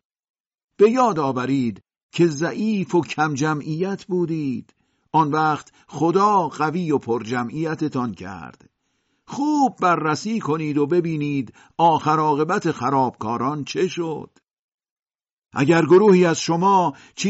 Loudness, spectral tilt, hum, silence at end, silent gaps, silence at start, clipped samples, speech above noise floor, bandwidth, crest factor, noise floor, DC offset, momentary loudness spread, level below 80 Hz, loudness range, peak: -20 LUFS; -5.5 dB/octave; none; 0 s; 2.03-2.09 s, 14.53-14.68 s, 14.74-14.78 s, 14.91-14.96 s, 15.32-15.37 s; 0.8 s; under 0.1%; 50 dB; 8 kHz; 16 dB; -70 dBFS; under 0.1%; 11 LU; -64 dBFS; 4 LU; -6 dBFS